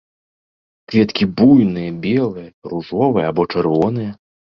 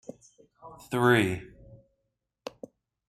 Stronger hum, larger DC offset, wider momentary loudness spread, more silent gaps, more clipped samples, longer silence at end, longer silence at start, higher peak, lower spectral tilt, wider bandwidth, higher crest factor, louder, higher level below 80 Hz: neither; neither; second, 15 LU vs 27 LU; first, 2.54-2.62 s vs none; neither; second, 0.45 s vs 1.65 s; first, 0.9 s vs 0.65 s; first, -2 dBFS vs -8 dBFS; first, -8.5 dB/octave vs -6 dB/octave; second, 6.2 kHz vs 14.5 kHz; second, 16 dB vs 22 dB; first, -16 LUFS vs -26 LUFS; first, -50 dBFS vs -62 dBFS